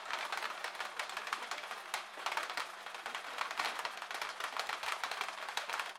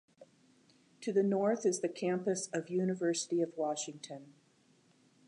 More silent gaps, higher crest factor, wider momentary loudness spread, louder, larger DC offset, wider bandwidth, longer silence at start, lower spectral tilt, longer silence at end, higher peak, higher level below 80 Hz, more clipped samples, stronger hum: neither; first, 24 dB vs 16 dB; second, 5 LU vs 12 LU; second, -40 LUFS vs -34 LUFS; neither; first, 16.5 kHz vs 11 kHz; second, 0 s vs 0.2 s; second, 1 dB/octave vs -5 dB/octave; second, 0 s vs 0.95 s; about the same, -18 dBFS vs -20 dBFS; about the same, -84 dBFS vs -88 dBFS; neither; neither